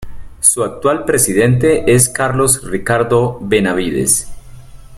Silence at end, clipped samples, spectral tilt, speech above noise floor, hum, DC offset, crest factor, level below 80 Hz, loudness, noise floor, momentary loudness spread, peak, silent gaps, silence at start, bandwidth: 0 s; under 0.1%; -4.5 dB/octave; 20 dB; none; under 0.1%; 14 dB; -36 dBFS; -13 LUFS; -34 dBFS; 5 LU; 0 dBFS; none; 0 s; 16.5 kHz